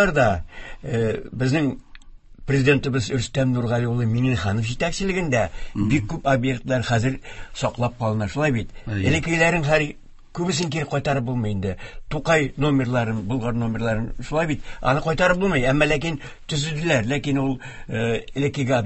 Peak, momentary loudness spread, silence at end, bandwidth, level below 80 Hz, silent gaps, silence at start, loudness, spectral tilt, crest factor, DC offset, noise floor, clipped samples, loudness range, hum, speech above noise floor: -4 dBFS; 9 LU; 0 s; 8.6 kHz; -40 dBFS; none; 0 s; -22 LUFS; -6 dB/octave; 18 dB; under 0.1%; -42 dBFS; under 0.1%; 2 LU; none; 21 dB